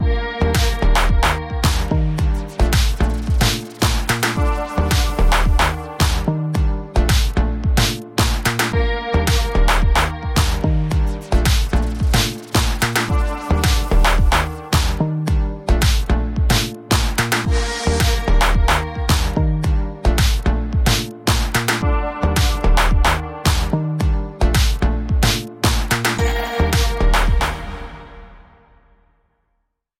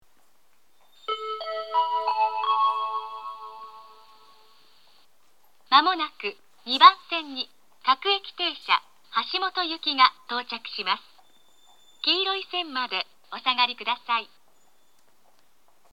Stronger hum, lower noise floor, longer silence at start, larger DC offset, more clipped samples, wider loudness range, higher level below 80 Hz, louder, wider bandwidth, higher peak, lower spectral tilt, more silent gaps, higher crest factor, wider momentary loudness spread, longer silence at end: neither; about the same, -70 dBFS vs -67 dBFS; second, 0 s vs 1.1 s; second, under 0.1% vs 0.2%; neither; second, 1 LU vs 6 LU; first, -20 dBFS vs -84 dBFS; first, -18 LUFS vs -24 LUFS; first, 17 kHz vs 11 kHz; second, -4 dBFS vs 0 dBFS; first, -4.5 dB/octave vs -1.5 dB/octave; neither; second, 14 dB vs 26 dB; second, 4 LU vs 14 LU; about the same, 1.6 s vs 1.7 s